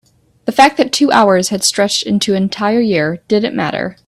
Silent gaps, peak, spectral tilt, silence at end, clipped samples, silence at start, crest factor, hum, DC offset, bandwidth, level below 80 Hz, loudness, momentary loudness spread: none; 0 dBFS; -4 dB/octave; 0.15 s; under 0.1%; 0.45 s; 14 dB; none; under 0.1%; 14 kHz; -52 dBFS; -13 LUFS; 7 LU